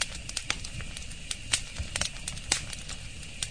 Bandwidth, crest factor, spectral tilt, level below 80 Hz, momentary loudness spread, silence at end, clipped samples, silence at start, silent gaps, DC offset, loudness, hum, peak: 10.5 kHz; 30 dB; -1 dB/octave; -42 dBFS; 10 LU; 0 s; under 0.1%; 0 s; none; 0.5%; -33 LUFS; none; -6 dBFS